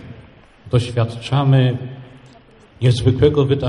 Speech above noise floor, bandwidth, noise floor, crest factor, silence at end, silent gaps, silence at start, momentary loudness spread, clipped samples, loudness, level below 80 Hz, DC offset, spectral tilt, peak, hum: 31 dB; 11 kHz; -46 dBFS; 16 dB; 0 s; none; 0 s; 11 LU; under 0.1%; -17 LUFS; -40 dBFS; under 0.1%; -7.5 dB/octave; -2 dBFS; none